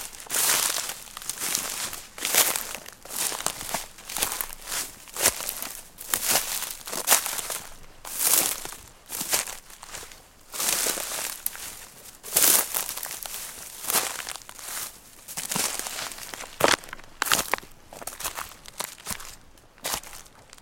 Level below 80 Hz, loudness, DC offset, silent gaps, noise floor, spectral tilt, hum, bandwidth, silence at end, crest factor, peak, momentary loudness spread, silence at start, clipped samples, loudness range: -54 dBFS; -26 LUFS; under 0.1%; none; -51 dBFS; 0.5 dB/octave; none; 17 kHz; 0 s; 30 dB; 0 dBFS; 18 LU; 0 s; under 0.1%; 5 LU